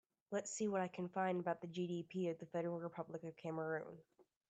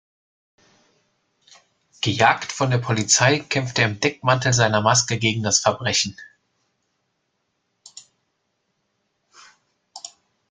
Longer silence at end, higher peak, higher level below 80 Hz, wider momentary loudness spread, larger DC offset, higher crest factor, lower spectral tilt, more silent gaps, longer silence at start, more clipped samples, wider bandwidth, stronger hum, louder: second, 0.25 s vs 0.45 s; second, -26 dBFS vs -2 dBFS; second, -86 dBFS vs -58 dBFS; second, 8 LU vs 11 LU; neither; about the same, 18 dB vs 22 dB; first, -5.5 dB/octave vs -3 dB/octave; neither; second, 0.3 s vs 2 s; neither; about the same, 9 kHz vs 9.6 kHz; neither; second, -44 LUFS vs -19 LUFS